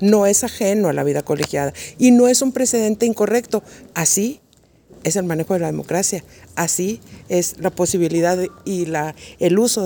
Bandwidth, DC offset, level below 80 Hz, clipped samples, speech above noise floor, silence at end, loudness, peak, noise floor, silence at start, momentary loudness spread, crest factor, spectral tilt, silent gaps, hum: 19.5 kHz; under 0.1%; -54 dBFS; under 0.1%; 34 dB; 0 s; -18 LUFS; -2 dBFS; -52 dBFS; 0 s; 11 LU; 18 dB; -4.5 dB/octave; none; none